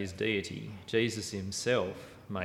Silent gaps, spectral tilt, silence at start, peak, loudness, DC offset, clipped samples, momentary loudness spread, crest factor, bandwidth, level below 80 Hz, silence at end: none; -4.5 dB/octave; 0 s; -16 dBFS; -33 LUFS; under 0.1%; under 0.1%; 11 LU; 18 dB; 16 kHz; -64 dBFS; 0 s